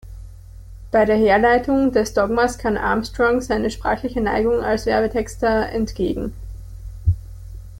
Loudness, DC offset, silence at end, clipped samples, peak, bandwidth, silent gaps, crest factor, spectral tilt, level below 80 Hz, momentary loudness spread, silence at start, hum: -19 LUFS; under 0.1%; 0 s; under 0.1%; -4 dBFS; 16.5 kHz; none; 16 dB; -6 dB/octave; -34 dBFS; 21 LU; 0.05 s; none